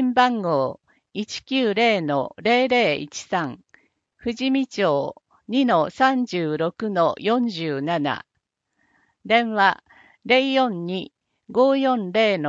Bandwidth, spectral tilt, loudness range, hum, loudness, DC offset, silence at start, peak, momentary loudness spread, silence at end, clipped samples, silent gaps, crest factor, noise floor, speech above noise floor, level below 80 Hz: 7.8 kHz; -5 dB/octave; 3 LU; none; -21 LUFS; under 0.1%; 0 s; -2 dBFS; 12 LU; 0 s; under 0.1%; none; 20 dB; -77 dBFS; 56 dB; -66 dBFS